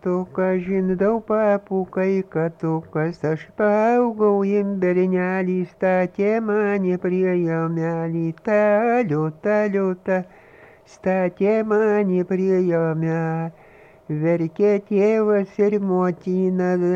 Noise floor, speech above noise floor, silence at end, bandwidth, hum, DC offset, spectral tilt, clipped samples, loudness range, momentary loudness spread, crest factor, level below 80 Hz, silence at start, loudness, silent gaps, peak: -48 dBFS; 28 dB; 0 s; 7.2 kHz; none; under 0.1%; -9.5 dB/octave; under 0.1%; 2 LU; 6 LU; 12 dB; -60 dBFS; 0.05 s; -21 LUFS; none; -8 dBFS